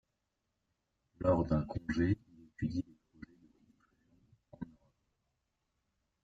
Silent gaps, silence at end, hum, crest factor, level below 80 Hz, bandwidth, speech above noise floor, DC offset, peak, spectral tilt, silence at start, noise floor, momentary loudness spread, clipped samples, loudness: none; 1.6 s; none; 22 dB; -56 dBFS; 7.8 kHz; 52 dB; under 0.1%; -18 dBFS; -9 dB/octave; 1.2 s; -85 dBFS; 25 LU; under 0.1%; -35 LUFS